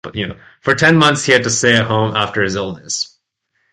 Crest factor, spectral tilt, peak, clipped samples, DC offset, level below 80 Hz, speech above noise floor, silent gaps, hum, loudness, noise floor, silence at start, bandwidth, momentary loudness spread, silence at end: 16 dB; -3.5 dB/octave; 0 dBFS; under 0.1%; under 0.1%; -48 dBFS; 52 dB; none; none; -14 LUFS; -67 dBFS; 0.05 s; 11.5 kHz; 13 LU; 0.65 s